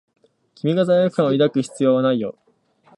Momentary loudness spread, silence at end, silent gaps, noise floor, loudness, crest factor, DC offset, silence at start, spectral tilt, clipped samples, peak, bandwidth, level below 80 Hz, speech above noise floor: 8 LU; 0.65 s; none; -56 dBFS; -19 LUFS; 14 dB; under 0.1%; 0.65 s; -7 dB/octave; under 0.1%; -6 dBFS; 11 kHz; -70 dBFS; 38 dB